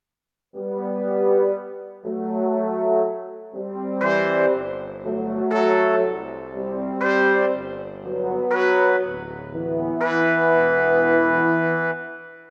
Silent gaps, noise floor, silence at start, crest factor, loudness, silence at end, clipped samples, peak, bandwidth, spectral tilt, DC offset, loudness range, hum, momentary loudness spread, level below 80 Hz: none; -86 dBFS; 0.55 s; 16 dB; -21 LUFS; 0.05 s; under 0.1%; -6 dBFS; 7.2 kHz; -7.5 dB/octave; under 0.1%; 4 LU; none; 15 LU; -60 dBFS